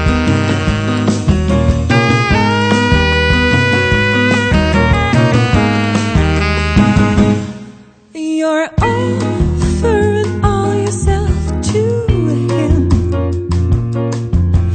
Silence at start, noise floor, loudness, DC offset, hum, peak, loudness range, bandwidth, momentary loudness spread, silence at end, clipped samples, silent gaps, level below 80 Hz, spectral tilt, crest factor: 0 s; -37 dBFS; -13 LUFS; under 0.1%; none; 0 dBFS; 3 LU; 9.2 kHz; 5 LU; 0 s; under 0.1%; none; -22 dBFS; -6 dB/octave; 12 dB